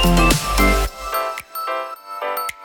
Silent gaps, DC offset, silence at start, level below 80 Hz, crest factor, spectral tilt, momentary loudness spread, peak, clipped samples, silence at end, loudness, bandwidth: none; under 0.1%; 0 s; -24 dBFS; 18 dB; -4 dB/octave; 11 LU; -2 dBFS; under 0.1%; 0 s; -20 LUFS; 20 kHz